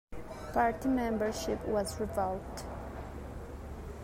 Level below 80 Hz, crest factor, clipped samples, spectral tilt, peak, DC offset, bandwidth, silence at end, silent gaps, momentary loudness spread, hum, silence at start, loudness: -48 dBFS; 18 dB; under 0.1%; -5.5 dB/octave; -16 dBFS; under 0.1%; 16 kHz; 0 s; none; 14 LU; none; 0.1 s; -35 LUFS